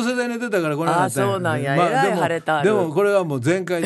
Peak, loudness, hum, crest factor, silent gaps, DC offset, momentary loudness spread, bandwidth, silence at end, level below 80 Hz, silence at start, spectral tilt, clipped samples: -4 dBFS; -20 LUFS; none; 14 dB; none; under 0.1%; 4 LU; 12.5 kHz; 0 s; -66 dBFS; 0 s; -5.5 dB/octave; under 0.1%